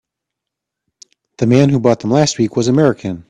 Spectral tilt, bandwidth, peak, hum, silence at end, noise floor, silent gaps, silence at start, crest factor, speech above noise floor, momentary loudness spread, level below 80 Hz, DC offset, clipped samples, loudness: -6 dB/octave; 10 kHz; 0 dBFS; none; 0.1 s; -81 dBFS; none; 1.4 s; 16 dB; 68 dB; 4 LU; -50 dBFS; under 0.1%; under 0.1%; -14 LUFS